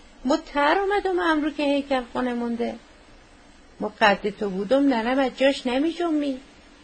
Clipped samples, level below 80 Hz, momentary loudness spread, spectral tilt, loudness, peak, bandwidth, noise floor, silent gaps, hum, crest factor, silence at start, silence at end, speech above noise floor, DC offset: under 0.1%; -52 dBFS; 9 LU; -5 dB/octave; -23 LUFS; -4 dBFS; 9.6 kHz; -50 dBFS; none; none; 20 dB; 0.2 s; 0.4 s; 27 dB; under 0.1%